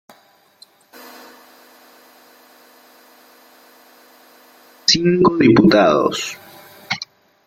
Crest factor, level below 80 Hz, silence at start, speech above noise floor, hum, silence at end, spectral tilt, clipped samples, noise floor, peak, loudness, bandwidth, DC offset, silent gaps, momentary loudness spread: 20 dB; -54 dBFS; 4.9 s; 40 dB; none; 0.45 s; -5 dB/octave; under 0.1%; -54 dBFS; 0 dBFS; -15 LUFS; 16 kHz; under 0.1%; none; 24 LU